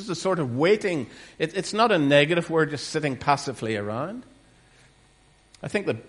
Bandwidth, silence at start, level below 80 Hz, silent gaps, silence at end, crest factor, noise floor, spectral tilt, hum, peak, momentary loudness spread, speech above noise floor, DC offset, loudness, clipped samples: 11.5 kHz; 0 s; -62 dBFS; none; 0.05 s; 22 dB; -58 dBFS; -5 dB/octave; none; -4 dBFS; 13 LU; 34 dB; under 0.1%; -24 LUFS; under 0.1%